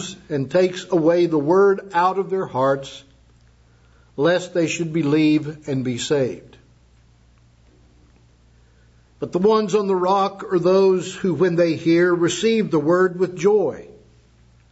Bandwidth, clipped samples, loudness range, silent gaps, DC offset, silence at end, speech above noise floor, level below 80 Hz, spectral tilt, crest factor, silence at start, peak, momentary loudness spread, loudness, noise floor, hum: 8 kHz; under 0.1%; 9 LU; none; under 0.1%; 0.85 s; 35 dB; -56 dBFS; -6 dB/octave; 14 dB; 0 s; -6 dBFS; 9 LU; -19 LUFS; -53 dBFS; none